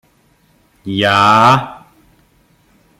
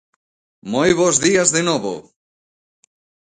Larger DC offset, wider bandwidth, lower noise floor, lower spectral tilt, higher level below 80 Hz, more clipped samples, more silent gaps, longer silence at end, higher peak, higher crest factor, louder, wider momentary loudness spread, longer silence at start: neither; first, 16 kHz vs 9.6 kHz; second, -54 dBFS vs under -90 dBFS; first, -5 dB/octave vs -3 dB/octave; about the same, -54 dBFS vs -54 dBFS; neither; neither; second, 1.2 s vs 1.35 s; about the same, 0 dBFS vs 0 dBFS; about the same, 16 dB vs 20 dB; first, -11 LUFS vs -16 LUFS; first, 22 LU vs 16 LU; first, 0.85 s vs 0.65 s